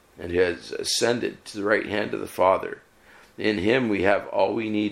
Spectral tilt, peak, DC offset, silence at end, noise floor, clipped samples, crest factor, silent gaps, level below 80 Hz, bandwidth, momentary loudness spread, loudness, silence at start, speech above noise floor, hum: -4 dB/octave; -4 dBFS; under 0.1%; 0 s; -53 dBFS; under 0.1%; 20 dB; none; -58 dBFS; 16.5 kHz; 8 LU; -24 LUFS; 0.15 s; 29 dB; none